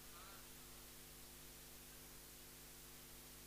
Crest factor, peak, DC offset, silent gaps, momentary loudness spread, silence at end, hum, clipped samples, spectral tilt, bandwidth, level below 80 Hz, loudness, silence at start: 14 dB; -44 dBFS; under 0.1%; none; 1 LU; 0 s; 50 Hz at -65 dBFS; under 0.1%; -2 dB/octave; 15.5 kHz; -68 dBFS; -57 LUFS; 0 s